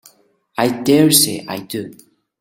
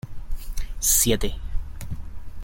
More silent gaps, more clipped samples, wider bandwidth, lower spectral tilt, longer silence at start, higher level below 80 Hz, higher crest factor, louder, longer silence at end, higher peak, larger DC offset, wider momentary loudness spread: neither; neither; about the same, 17 kHz vs 17 kHz; about the same, -3.5 dB/octave vs -3 dB/octave; first, 0.6 s vs 0.05 s; second, -56 dBFS vs -30 dBFS; about the same, 18 dB vs 18 dB; first, -15 LUFS vs -21 LUFS; first, 0.45 s vs 0 s; first, 0 dBFS vs -6 dBFS; neither; second, 18 LU vs 21 LU